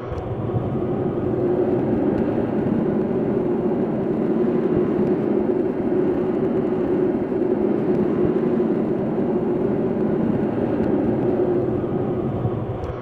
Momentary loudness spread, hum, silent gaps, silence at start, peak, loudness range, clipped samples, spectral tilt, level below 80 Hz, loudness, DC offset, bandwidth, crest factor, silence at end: 3 LU; none; none; 0 s; -8 dBFS; 1 LU; under 0.1%; -10.5 dB/octave; -44 dBFS; -21 LUFS; under 0.1%; 4.6 kHz; 12 dB; 0 s